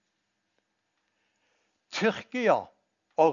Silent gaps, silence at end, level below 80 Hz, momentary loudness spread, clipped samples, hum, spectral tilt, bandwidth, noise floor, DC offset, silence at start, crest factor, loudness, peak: none; 0 s; -84 dBFS; 10 LU; under 0.1%; none; -5 dB/octave; 7.4 kHz; -79 dBFS; under 0.1%; 1.9 s; 22 dB; -28 LUFS; -8 dBFS